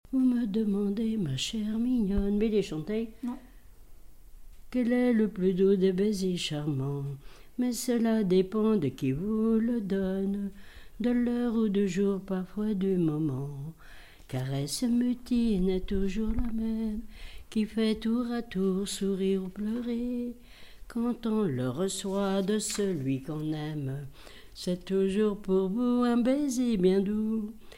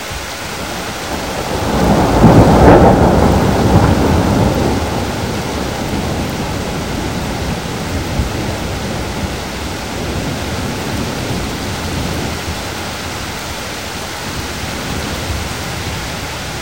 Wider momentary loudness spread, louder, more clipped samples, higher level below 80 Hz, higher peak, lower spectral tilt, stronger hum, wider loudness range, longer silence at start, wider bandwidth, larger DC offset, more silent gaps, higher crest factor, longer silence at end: second, 10 LU vs 13 LU; second, -29 LUFS vs -16 LUFS; second, under 0.1% vs 0.2%; second, -46 dBFS vs -24 dBFS; second, -14 dBFS vs 0 dBFS; about the same, -6.5 dB/octave vs -5.5 dB/octave; neither; second, 3 LU vs 11 LU; about the same, 0.05 s vs 0 s; about the same, 16 kHz vs 17 kHz; second, 0.1% vs 0.7%; neither; about the same, 16 dB vs 14 dB; about the same, 0 s vs 0 s